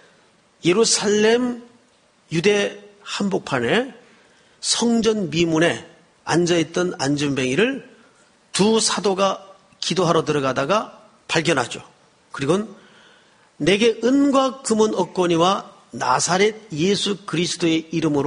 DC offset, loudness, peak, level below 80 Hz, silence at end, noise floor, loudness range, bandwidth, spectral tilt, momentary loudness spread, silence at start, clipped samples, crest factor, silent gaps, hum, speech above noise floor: under 0.1%; -20 LUFS; -2 dBFS; -58 dBFS; 0 s; -58 dBFS; 3 LU; 10.5 kHz; -4 dB/octave; 11 LU; 0.65 s; under 0.1%; 18 dB; none; none; 38 dB